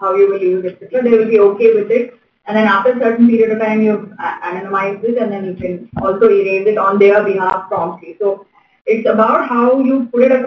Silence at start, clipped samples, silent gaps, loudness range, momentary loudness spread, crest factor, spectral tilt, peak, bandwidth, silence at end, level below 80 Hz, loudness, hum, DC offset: 0 s; under 0.1%; 8.81-8.85 s; 3 LU; 12 LU; 12 dB; -8.5 dB/octave; 0 dBFS; 6 kHz; 0 s; -54 dBFS; -14 LUFS; none; under 0.1%